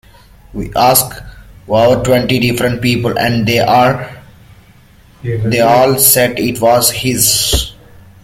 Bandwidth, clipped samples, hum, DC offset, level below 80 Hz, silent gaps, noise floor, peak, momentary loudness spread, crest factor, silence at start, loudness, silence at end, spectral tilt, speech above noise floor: 17 kHz; under 0.1%; none; under 0.1%; -32 dBFS; none; -43 dBFS; 0 dBFS; 14 LU; 14 dB; 0.55 s; -11 LUFS; 0.5 s; -3.5 dB/octave; 32 dB